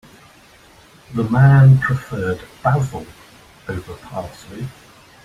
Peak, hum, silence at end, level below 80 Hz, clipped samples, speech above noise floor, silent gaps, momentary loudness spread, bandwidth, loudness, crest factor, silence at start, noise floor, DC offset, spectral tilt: -2 dBFS; none; 0.55 s; -46 dBFS; under 0.1%; 31 dB; none; 22 LU; 10 kHz; -16 LUFS; 16 dB; 1.1 s; -47 dBFS; under 0.1%; -8.5 dB/octave